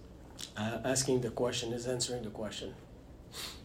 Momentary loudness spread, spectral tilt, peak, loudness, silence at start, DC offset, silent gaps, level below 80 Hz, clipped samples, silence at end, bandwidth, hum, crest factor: 20 LU; -3.5 dB/octave; -18 dBFS; -35 LUFS; 0 s; under 0.1%; none; -56 dBFS; under 0.1%; 0 s; 16 kHz; none; 18 dB